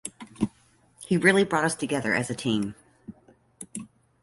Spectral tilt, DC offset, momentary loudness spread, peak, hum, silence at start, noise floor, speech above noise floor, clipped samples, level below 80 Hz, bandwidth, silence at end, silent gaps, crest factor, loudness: -4.5 dB/octave; under 0.1%; 20 LU; -4 dBFS; none; 0.05 s; -61 dBFS; 37 dB; under 0.1%; -60 dBFS; 12 kHz; 0.35 s; none; 24 dB; -25 LUFS